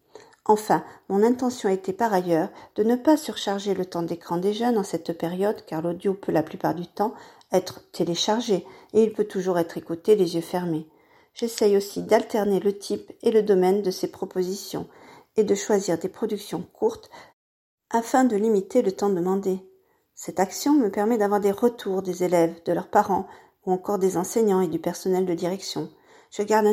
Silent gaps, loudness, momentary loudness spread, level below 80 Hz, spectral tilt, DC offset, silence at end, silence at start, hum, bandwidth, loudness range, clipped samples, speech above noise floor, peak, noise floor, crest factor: 17.33-17.78 s; -24 LUFS; 9 LU; -68 dBFS; -5.5 dB/octave; under 0.1%; 0 s; 0.15 s; none; 16.5 kHz; 3 LU; under 0.1%; 36 dB; -4 dBFS; -59 dBFS; 20 dB